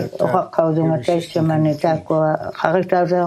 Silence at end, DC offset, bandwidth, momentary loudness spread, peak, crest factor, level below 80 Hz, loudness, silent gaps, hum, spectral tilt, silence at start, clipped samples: 0 s; under 0.1%; 12.5 kHz; 3 LU; 0 dBFS; 18 dB; -60 dBFS; -18 LUFS; none; none; -8 dB/octave; 0 s; under 0.1%